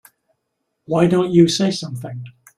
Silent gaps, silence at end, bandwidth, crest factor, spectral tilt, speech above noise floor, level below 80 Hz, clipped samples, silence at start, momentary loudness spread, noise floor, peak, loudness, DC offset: none; 0.25 s; 13.5 kHz; 18 dB; -6 dB/octave; 58 dB; -56 dBFS; under 0.1%; 0.9 s; 17 LU; -74 dBFS; -2 dBFS; -17 LUFS; under 0.1%